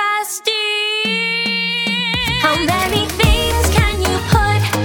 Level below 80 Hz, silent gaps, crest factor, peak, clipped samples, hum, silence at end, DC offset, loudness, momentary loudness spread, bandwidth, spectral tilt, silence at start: -26 dBFS; none; 14 dB; -2 dBFS; under 0.1%; none; 0 s; under 0.1%; -15 LUFS; 3 LU; over 20 kHz; -4 dB/octave; 0 s